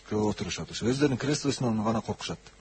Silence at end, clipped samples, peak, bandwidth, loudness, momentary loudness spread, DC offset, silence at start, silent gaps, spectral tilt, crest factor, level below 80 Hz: 0.1 s; under 0.1%; -12 dBFS; 8.8 kHz; -29 LUFS; 8 LU; under 0.1%; 0.05 s; none; -5 dB/octave; 16 dB; -54 dBFS